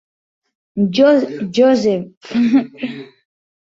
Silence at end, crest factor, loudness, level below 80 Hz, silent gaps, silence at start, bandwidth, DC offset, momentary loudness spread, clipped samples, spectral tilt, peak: 0.55 s; 16 dB; -15 LUFS; -60 dBFS; 2.17-2.21 s; 0.75 s; 7.6 kHz; under 0.1%; 15 LU; under 0.1%; -6.5 dB/octave; -2 dBFS